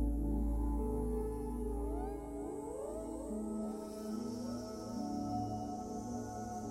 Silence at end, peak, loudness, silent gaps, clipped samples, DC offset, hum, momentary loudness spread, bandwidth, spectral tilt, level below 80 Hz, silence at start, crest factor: 0 s; -26 dBFS; -41 LUFS; none; under 0.1%; under 0.1%; none; 6 LU; 14 kHz; -7.5 dB/octave; -44 dBFS; 0 s; 14 dB